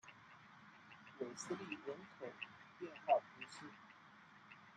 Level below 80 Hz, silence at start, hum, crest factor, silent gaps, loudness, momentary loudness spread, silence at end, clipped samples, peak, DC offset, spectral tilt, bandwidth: under -90 dBFS; 0.05 s; none; 24 dB; none; -45 LUFS; 23 LU; 0 s; under 0.1%; -24 dBFS; under 0.1%; -4 dB/octave; 9.8 kHz